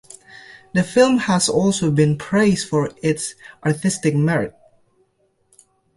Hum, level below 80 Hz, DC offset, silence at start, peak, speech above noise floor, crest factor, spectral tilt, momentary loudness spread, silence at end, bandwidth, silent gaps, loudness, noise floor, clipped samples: none; -52 dBFS; under 0.1%; 0.35 s; -2 dBFS; 46 dB; 18 dB; -5.5 dB/octave; 9 LU; 1.45 s; 11.5 kHz; none; -19 LUFS; -64 dBFS; under 0.1%